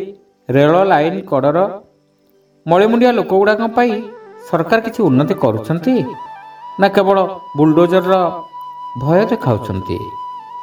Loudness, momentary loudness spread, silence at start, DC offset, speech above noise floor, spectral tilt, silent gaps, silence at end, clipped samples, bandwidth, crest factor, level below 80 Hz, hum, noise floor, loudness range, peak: -14 LUFS; 19 LU; 0 s; under 0.1%; 41 dB; -8 dB/octave; none; 0 s; under 0.1%; 19 kHz; 14 dB; -52 dBFS; none; -55 dBFS; 2 LU; 0 dBFS